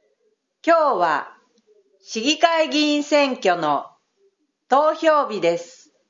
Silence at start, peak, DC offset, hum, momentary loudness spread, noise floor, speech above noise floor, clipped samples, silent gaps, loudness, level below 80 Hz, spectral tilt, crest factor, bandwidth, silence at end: 0.65 s; 0 dBFS; under 0.1%; none; 9 LU; -68 dBFS; 50 dB; under 0.1%; none; -19 LUFS; -86 dBFS; -3 dB/octave; 20 dB; 7.6 kHz; 0.45 s